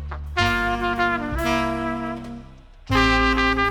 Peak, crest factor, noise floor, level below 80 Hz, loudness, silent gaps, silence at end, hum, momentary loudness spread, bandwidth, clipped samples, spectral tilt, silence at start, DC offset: -6 dBFS; 18 dB; -43 dBFS; -32 dBFS; -21 LUFS; none; 0 s; none; 13 LU; 19 kHz; under 0.1%; -5 dB/octave; 0 s; under 0.1%